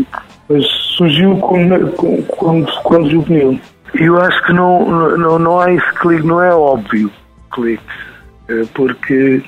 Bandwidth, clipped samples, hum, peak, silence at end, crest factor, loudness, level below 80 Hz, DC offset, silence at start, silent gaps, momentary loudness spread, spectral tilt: 10.5 kHz; under 0.1%; none; 0 dBFS; 0.05 s; 12 dB; -12 LUFS; -44 dBFS; under 0.1%; 0 s; none; 11 LU; -7.5 dB/octave